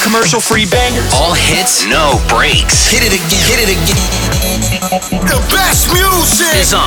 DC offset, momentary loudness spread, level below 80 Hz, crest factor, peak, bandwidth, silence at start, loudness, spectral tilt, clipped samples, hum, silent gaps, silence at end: 0.3%; 5 LU; -20 dBFS; 10 dB; 0 dBFS; over 20 kHz; 0 s; -9 LUFS; -2.5 dB/octave; under 0.1%; none; none; 0 s